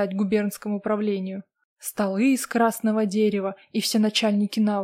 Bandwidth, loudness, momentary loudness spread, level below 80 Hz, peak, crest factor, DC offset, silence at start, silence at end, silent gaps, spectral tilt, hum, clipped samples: 16 kHz; -24 LUFS; 8 LU; -68 dBFS; -10 dBFS; 14 dB; under 0.1%; 0 s; 0 s; 1.64-1.76 s; -5 dB/octave; none; under 0.1%